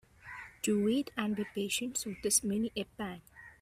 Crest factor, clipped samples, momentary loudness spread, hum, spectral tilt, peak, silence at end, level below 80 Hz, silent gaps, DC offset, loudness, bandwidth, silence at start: 20 dB; under 0.1%; 17 LU; none; -3.5 dB/octave; -14 dBFS; 0.1 s; -64 dBFS; none; under 0.1%; -33 LUFS; 16 kHz; 0.25 s